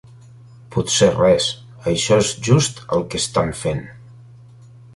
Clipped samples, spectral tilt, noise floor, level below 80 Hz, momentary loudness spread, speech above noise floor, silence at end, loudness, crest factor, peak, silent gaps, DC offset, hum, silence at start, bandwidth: under 0.1%; -4.5 dB/octave; -43 dBFS; -44 dBFS; 11 LU; 26 dB; 0.9 s; -18 LUFS; 18 dB; -2 dBFS; none; under 0.1%; none; 0.7 s; 11.5 kHz